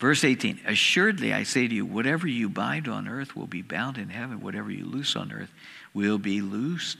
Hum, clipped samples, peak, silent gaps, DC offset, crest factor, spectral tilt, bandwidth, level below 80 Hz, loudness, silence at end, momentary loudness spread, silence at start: none; under 0.1%; -6 dBFS; none; under 0.1%; 20 dB; -4 dB/octave; 15 kHz; -72 dBFS; -26 LUFS; 0 s; 13 LU; 0 s